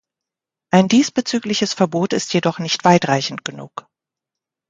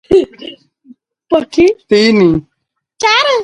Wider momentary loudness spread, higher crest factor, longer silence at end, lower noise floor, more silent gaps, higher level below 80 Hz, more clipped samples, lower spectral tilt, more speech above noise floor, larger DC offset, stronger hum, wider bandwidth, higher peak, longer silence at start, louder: about the same, 15 LU vs 14 LU; first, 18 dB vs 12 dB; first, 0.9 s vs 0 s; first, -86 dBFS vs -68 dBFS; neither; second, -62 dBFS vs -42 dBFS; neither; about the same, -4.5 dB/octave vs -5 dB/octave; first, 69 dB vs 57 dB; neither; neither; second, 9.2 kHz vs 11 kHz; about the same, 0 dBFS vs 0 dBFS; first, 0.75 s vs 0.1 s; second, -17 LUFS vs -11 LUFS